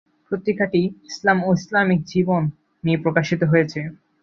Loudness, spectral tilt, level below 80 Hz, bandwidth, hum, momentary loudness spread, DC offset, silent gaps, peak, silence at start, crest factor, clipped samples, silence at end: -21 LUFS; -7 dB/octave; -58 dBFS; 7.4 kHz; none; 9 LU; under 0.1%; none; -2 dBFS; 0.3 s; 18 dB; under 0.1%; 0.3 s